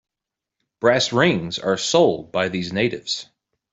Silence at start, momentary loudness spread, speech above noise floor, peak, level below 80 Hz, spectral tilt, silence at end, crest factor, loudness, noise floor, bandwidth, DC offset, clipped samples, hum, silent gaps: 0.8 s; 8 LU; 66 dB; -2 dBFS; -58 dBFS; -4 dB/octave; 0.5 s; 18 dB; -20 LUFS; -86 dBFS; 8.2 kHz; under 0.1%; under 0.1%; none; none